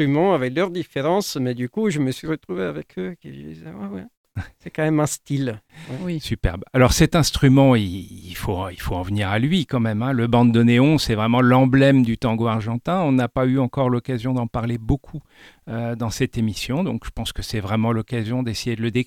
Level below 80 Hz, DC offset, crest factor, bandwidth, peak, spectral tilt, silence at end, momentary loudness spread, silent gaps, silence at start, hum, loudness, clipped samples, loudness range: -38 dBFS; under 0.1%; 18 dB; 16.5 kHz; -2 dBFS; -6 dB/octave; 0 s; 17 LU; 4.17-4.24 s; 0 s; none; -20 LUFS; under 0.1%; 10 LU